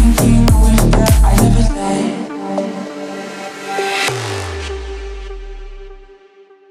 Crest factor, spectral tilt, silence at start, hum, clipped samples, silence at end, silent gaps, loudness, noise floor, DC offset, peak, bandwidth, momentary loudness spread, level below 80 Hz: 14 dB; -5.5 dB/octave; 0 s; none; under 0.1%; 0.65 s; none; -15 LUFS; -45 dBFS; under 0.1%; 0 dBFS; 16 kHz; 19 LU; -18 dBFS